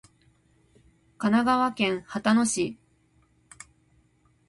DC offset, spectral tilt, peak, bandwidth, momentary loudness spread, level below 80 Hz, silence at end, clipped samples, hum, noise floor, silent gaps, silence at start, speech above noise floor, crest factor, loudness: under 0.1%; -4 dB/octave; -8 dBFS; 11.5 kHz; 26 LU; -62 dBFS; 1.75 s; under 0.1%; none; -64 dBFS; none; 1.2 s; 40 dB; 20 dB; -25 LUFS